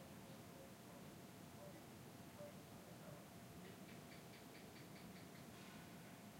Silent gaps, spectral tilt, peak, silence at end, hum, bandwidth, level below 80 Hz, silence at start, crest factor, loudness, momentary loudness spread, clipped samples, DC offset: none; -4.5 dB/octave; -44 dBFS; 0 s; none; 16 kHz; -80 dBFS; 0 s; 14 dB; -59 LUFS; 1 LU; under 0.1%; under 0.1%